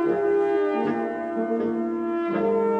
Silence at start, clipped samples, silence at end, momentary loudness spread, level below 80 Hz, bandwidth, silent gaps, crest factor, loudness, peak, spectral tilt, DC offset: 0 s; under 0.1%; 0 s; 5 LU; -64 dBFS; 5.8 kHz; none; 12 dB; -24 LUFS; -12 dBFS; -8.5 dB/octave; under 0.1%